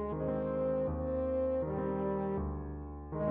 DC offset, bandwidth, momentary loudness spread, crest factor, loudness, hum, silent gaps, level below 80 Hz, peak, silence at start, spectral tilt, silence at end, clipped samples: under 0.1%; 3.7 kHz; 9 LU; 12 dB; -35 LUFS; none; none; -46 dBFS; -22 dBFS; 0 s; -10 dB/octave; 0 s; under 0.1%